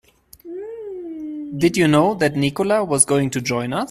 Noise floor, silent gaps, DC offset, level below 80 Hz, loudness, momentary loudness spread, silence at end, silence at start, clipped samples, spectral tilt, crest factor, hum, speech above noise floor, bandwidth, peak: -41 dBFS; none; under 0.1%; -54 dBFS; -18 LUFS; 16 LU; 0 s; 0.45 s; under 0.1%; -4.5 dB/octave; 20 dB; none; 23 dB; 14.5 kHz; 0 dBFS